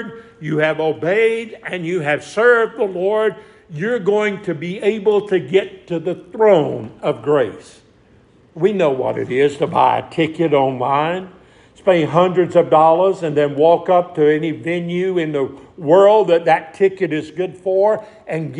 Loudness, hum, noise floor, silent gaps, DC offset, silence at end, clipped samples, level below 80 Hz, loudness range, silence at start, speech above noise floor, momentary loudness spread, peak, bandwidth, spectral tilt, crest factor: -17 LUFS; none; -50 dBFS; none; under 0.1%; 0 s; under 0.1%; -60 dBFS; 4 LU; 0 s; 34 dB; 11 LU; 0 dBFS; 10.5 kHz; -7 dB/octave; 16 dB